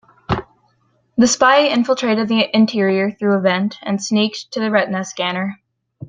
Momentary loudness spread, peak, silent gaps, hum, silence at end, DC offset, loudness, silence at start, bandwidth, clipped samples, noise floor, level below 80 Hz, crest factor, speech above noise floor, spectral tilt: 11 LU; 0 dBFS; none; none; 0 s; under 0.1%; -17 LUFS; 0.3 s; 9.4 kHz; under 0.1%; -61 dBFS; -50 dBFS; 16 dB; 45 dB; -4 dB/octave